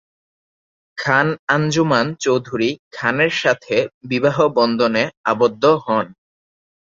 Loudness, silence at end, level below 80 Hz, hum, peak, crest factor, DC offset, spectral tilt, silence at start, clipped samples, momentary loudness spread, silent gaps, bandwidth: -18 LUFS; 0.75 s; -60 dBFS; none; -2 dBFS; 18 dB; under 0.1%; -5 dB/octave; 0.95 s; under 0.1%; 6 LU; 1.39-1.47 s, 2.79-2.91 s, 3.94-4.01 s, 5.17-5.24 s; 7.6 kHz